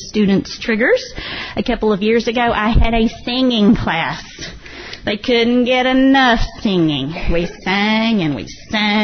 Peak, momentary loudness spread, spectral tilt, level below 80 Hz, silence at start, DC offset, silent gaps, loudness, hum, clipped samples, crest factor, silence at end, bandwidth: -4 dBFS; 12 LU; -5.5 dB/octave; -28 dBFS; 0 s; under 0.1%; none; -16 LUFS; none; under 0.1%; 12 dB; 0 s; 6.6 kHz